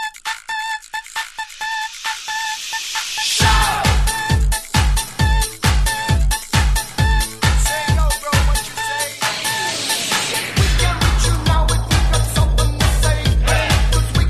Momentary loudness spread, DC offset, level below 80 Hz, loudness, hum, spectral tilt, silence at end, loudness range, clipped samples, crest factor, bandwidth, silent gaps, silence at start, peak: 8 LU; under 0.1%; -20 dBFS; -18 LUFS; none; -3.5 dB/octave; 0 s; 2 LU; under 0.1%; 16 dB; 13 kHz; none; 0 s; -2 dBFS